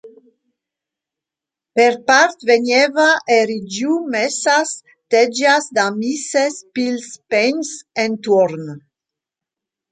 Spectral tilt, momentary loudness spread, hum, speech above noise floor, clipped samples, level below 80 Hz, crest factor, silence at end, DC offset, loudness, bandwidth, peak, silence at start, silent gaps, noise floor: -3 dB/octave; 10 LU; none; 71 dB; under 0.1%; -70 dBFS; 16 dB; 1.1 s; under 0.1%; -16 LUFS; 9.4 kHz; 0 dBFS; 0.05 s; none; -87 dBFS